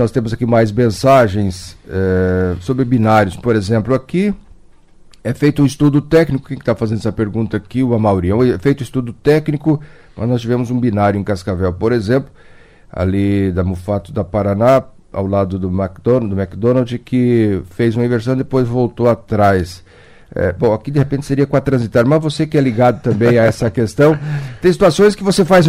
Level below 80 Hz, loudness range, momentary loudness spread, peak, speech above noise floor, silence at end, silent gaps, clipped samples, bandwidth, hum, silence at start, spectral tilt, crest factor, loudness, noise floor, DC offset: -40 dBFS; 3 LU; 8 LU; -2 dBFS; 29 dB; 0 s; none; under 0.1%; 15.5 kHz; none; 0 s; -7.5 dB/octave; 12 dB; -15 LUFS; -43 dBFS; under 0.1%